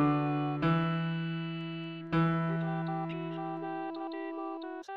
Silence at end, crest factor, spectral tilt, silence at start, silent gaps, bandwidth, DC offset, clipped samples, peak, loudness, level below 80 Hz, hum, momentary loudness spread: 0 s; 16 dB; -9 dB/octave; 0 s; none; 5 kHz; under 0.1%; under 0.1%; -16 dBFS; -34 LUFS; -62 dBFS; none; 10 LU